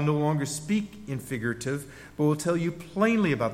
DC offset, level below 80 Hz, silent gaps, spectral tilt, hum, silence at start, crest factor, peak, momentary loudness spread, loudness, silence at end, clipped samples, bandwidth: under 0.1%; -58 dBFS; none; -6 dB/octave; none; 0 s; 16 dB; -12 dBFS; 11 LU; -28 LUFS; 0 s; under 0.1%; 16 kHz